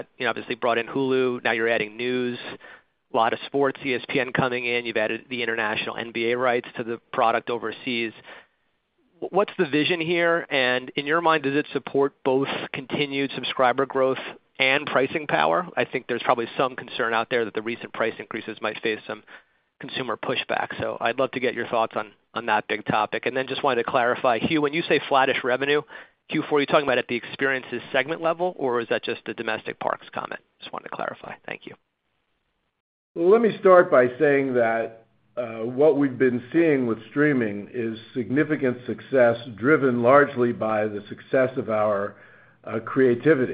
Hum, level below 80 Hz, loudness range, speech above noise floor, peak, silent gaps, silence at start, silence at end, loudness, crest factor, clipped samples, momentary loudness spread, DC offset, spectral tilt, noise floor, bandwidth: none; -68 dBFS; 7 LU; 50 dB; -2 dBFS; 32.80-33.15 s; 0 s; 0 s; -23 LUFS; 22 dB; under 0.1%; 12 LU; under 0.1%; -9.5 dB/octave; -74 dBFS; 5.2 kHz